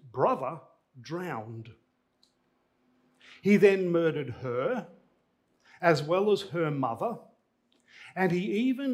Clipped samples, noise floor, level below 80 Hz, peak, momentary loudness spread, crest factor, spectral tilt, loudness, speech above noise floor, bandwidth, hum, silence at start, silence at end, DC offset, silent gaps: under 0.1%; -73 dBFS; -76 dBFS; -8 dBFS; 17 LU; 22 dB; -7 dB/octave; -28 LUFS; 45 dB; 14.5 kHz; none; 0.05 s; 0 s; under 0.1%; none